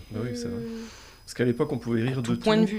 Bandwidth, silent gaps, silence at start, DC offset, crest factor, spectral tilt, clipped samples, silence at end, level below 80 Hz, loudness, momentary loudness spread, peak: 15.5 kHz; none; 0 s; under 0.1%; 18 dB; -6.5 dB/octave; under 0.1%; 0 s; -52 dBFS; -28 LUFS; 16 LU; -8 dBFS